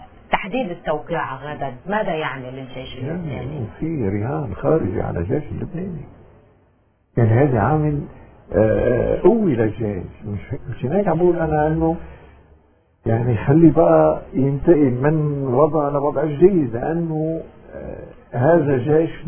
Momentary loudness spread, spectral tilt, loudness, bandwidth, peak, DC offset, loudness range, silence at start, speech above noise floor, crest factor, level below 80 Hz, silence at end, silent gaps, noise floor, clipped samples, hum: 15 LU; -12.5 dB/octave; -19 LUFS; 3.5 kHz; 0 dBFS; under 0.1%; 8 LU; 0 s; 40 dB; 18 dB; -40 dBFS; 0 s; none; -59 dBFS; under 0.1%; none